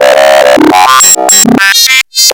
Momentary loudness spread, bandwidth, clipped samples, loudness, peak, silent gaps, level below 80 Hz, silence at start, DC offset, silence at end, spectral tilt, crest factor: 2 LU; over 20 kHz; 10%; -3 LUFS; 0 dBFS; none; -44 dBFS; 0 s; under 0.1%; 0 s; -1 dB/octave; 4 dB